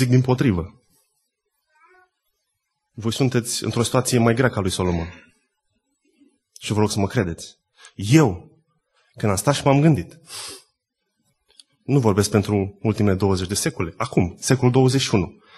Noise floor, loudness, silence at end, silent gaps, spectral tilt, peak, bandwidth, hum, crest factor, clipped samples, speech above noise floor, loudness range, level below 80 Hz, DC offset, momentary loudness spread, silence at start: -76 dBFS; -20 LUFS; 0.25 s; none; -5.5 dB/octave; -2 dBFS; 12.5 kHz; none; 20 dB; under 0.1%; 57 dB; 5 LU; -48 dBFS; under 0.1%; 17 LU; 0 s